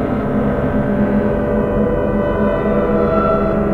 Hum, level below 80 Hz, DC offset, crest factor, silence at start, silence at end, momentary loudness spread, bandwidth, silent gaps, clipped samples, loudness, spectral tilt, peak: none; -28 dBFS; under 0.1%; 14 dB; 0 s; 0 s; 3 LU; 4.4 kHz; none; under 0.1%; -16 LUFS; -10 dB/octave; -2 dBFS